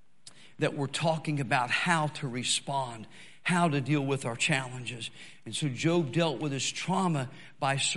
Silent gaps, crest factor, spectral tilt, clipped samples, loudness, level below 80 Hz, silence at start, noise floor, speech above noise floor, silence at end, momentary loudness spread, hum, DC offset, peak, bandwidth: none; 20 dB; -4 dB/octave; under 0.1%; -30 LUFS; -72 dBFS; 0.6 s; -56 dBFS; 26 dB; 0 s; 11 LU; none; 0.3%; -10 dBFS; 11.5 kHz